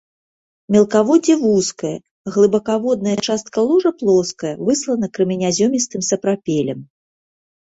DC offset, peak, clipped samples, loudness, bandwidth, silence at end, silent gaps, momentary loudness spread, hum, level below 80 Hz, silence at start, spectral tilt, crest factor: under 0.1%; -2 dBFS; under 0.1%; -17 LUFS; 8.2 kHz; 0.9 s; 2.11-2.25 s; 9 LU; none; -58 dBFS; 0.7 s; -5 dB/octave; 16 dB